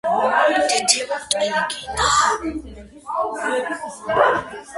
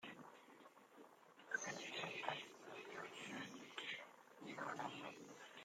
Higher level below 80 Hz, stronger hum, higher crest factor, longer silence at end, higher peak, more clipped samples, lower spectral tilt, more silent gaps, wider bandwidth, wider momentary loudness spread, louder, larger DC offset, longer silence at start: first, -46 dBFS vs under -90 dBFS; neither; about the same, 20 dB vs 24 dB; about the same, 0 s vs 0 s; first, 0 dBFS vs -28 dBFS; neither; about the same, -1.5 dB/octave vs -2.5 dB/octave; neither; second, 12 kHz vs 16 kHz; second, 12 LU vs 19 LU; first, -19 LUFS vs -50 LUFS; neither; about the same, 0.05 s vs 0 s